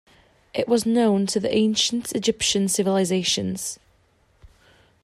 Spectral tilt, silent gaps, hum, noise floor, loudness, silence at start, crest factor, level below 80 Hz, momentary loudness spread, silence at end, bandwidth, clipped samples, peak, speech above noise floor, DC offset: -4 dB/octave; none; none; -61 dBFS; -22 LUFS; 0.55 s; 16 dB; -56 dBFS; 10 LU; 1.3 s; 15 kHz; under 0.1%; -8 dBFS; 40 dB; under 0.1%